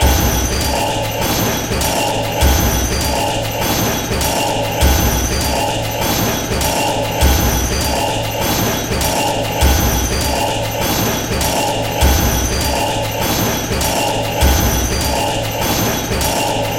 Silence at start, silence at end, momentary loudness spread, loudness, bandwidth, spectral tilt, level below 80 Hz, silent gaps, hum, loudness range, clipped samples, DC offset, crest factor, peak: 0 s; 0 s; 4 LU; -16 LUFS; 17 kHz; -3.5 dB/octave; -22 dBFS; none; none; 1 LU; under 0.1%; under 0.1%; 16 dB; 0 dBFS